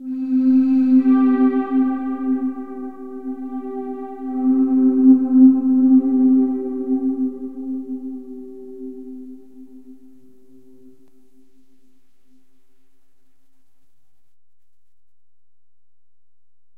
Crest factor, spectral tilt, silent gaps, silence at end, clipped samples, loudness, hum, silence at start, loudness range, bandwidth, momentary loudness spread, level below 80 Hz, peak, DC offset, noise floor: 18 dB; -9.5 dB/octave; none; 6.85 s; under 0.1%; -17 LUFS; none; 0 s; 19 LU; 2.8 kHz; 21 LU; -64 dBFS; -2 dBFS; 0.9%; -82 dBFS